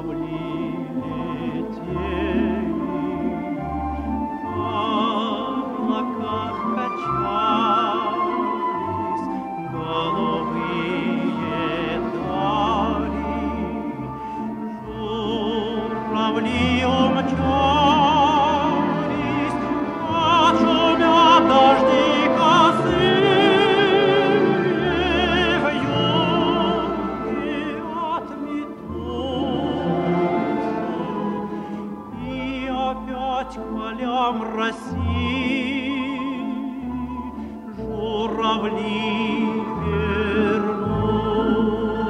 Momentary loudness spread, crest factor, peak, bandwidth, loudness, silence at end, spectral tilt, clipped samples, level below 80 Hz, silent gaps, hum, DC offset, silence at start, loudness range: 12 LU; 18 dB; -4 dBFS; 11 kHz; -21 LUFS; 0 s; -6 dB/octave; under 0.1%; -42 dBFS; none; none; under 0.1%; 0 s; 10 LU